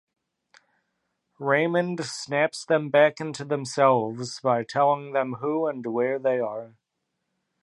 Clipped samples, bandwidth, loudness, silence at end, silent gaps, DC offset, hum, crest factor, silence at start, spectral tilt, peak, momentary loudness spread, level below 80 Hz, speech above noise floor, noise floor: under 0.1%; 11.5 kHz; -25 LUFS; 0.95 s; none; under 0.1%; none; 20 dB; 1.4 s; -5 dB/octave; -6 dBFS; 10 LU; -78 dBFS; 55 dB; -80 dBFS